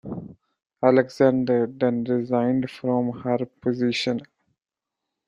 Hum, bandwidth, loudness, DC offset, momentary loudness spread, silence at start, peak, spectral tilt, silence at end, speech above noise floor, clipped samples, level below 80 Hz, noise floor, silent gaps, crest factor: none; 10.5 kHz; -23 LUFS; under 0.1%; 8 LU; 0.05 s; -4 dBFS; -7 dB/octave; 1.05 s; 65 dB; under 0.1%; -62 dBFS; -87 dBFS; none; 20 dB